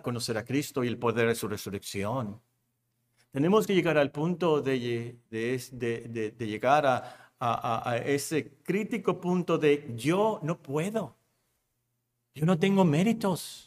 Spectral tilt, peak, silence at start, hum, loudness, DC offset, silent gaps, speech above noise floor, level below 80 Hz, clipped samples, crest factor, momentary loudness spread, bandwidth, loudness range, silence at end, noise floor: -6 dB/octave; -8 dBFS; 0.05 s; none; -29 LUFS; under 0.1%; none; 51 dB; -68 dBFS; under 0.1%; 20 dB; 10 LU; 15.5 kHz; 2 LU; 0.05 s; -79 dBFS